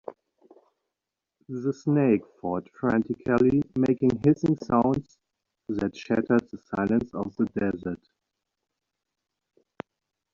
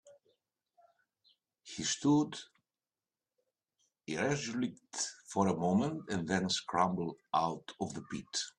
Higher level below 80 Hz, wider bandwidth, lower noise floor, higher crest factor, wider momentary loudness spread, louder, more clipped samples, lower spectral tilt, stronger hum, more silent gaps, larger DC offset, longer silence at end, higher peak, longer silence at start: first, -58 dBFS vs -72 dBFS; second, 7.2 kHz vs 11 kHz; about the same, -87 dBFS vs under -90 dBFS; about the same, 18 dB vs 22 dB; first, 16 LU vs 11 LU; first, -26 LUFS vs -34 LUFS; neither; first, -8 dB/octave vs -4.5 dB/octave; neither; neither; neither; first, 2.4 s vs 0.1 s; first, -8 dBFS vs -14 dBFS; about the same, 0.1 s vs 0.05 s